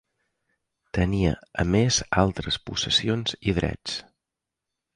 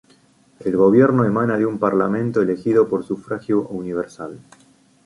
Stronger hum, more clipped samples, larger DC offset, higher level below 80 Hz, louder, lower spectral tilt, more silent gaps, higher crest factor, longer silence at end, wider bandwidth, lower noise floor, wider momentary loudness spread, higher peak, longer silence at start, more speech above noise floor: neither; neither; neither; first, -40 dBFS vs -58 dBFS; second, -25 LUFS vs -19 LUFS; second, -4.5 dB/octave vs -9 dB/octave; neither; about the same, 20 dB vs 18 dB; first, 0.95 s vs 0.7 s; about the same, 10.5 kHz vs 11.5 kHz; first, -86 dBFS vs -55 dBFS; second, 10 LU vs 13 LU; second, -6 dBFS vs -2 dBFS; first, 0.95 s vs 0.6 s; first, 62 dB vs 36 dB